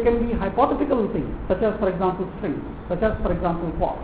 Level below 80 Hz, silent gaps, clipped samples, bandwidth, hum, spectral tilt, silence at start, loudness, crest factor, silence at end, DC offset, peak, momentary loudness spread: -34 dBFS; none; under 0.1%; 4 kHz; none; -11.5 dB/octave; 0 s; -24 LUFS; 16 dB; 0 s; 0.2%; -6 dBFS; 8 LU